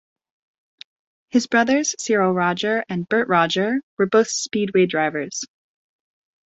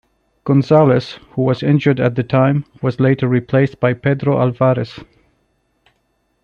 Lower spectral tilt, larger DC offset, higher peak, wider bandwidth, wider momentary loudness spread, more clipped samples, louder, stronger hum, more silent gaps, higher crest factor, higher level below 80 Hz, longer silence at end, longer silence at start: second, -4 dB/octave vs -9 dB/octave; neither; about the same, -4 dBFS vs -2 dBFS; first, 8.2 kHz vs 6.8 kHz; about the same, 6 LU vs 8 LU; neither; second, -20 LUFS vs -16 LUFS; neither; first, 3.83-3.97 s vs none; about the same, 18 dB vs 16 dB; second, -66 dBFS vs -52 dBFS; second, 1.05 s vs 1.4 s; first, 1.35 s vs 0.45 s